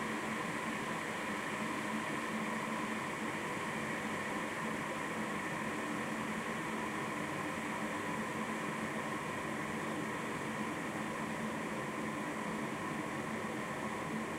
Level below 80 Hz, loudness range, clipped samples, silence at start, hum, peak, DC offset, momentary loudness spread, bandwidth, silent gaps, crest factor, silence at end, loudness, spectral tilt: -70 dBFS; 1 LU; under 0.1%; 0 s; none; -26 dBFS; under 0.1%; 2 LU; 16 kHz; none; 14 dB; 0 s; -38 LUFS; -4.5 dB/octave